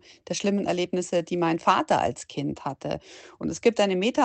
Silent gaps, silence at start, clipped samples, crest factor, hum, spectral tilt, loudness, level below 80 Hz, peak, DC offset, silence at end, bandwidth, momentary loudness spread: none; 0.3 s; under 0.1%; 20 dB; none; -5 dB/octave; -26 LUFS; -58 dBFS; -6 dBFS; under 0.1%; 0 s; 9.2 kHz; 11 LU